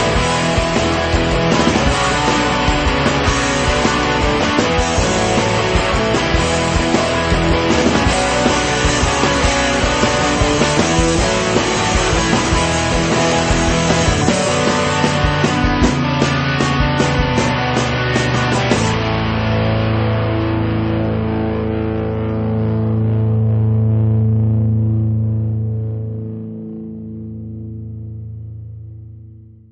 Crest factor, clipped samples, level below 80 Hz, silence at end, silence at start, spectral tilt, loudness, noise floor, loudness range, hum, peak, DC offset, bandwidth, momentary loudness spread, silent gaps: 16 dB; under 0.1%; -26 dBFS; 0.25 s; 0 s; -5 dB/octave; -15 LUFS; -39 dBFS; 4 LU; none; 0 dBFS; under 0.1%; 8.8 kHz; 11 LU; none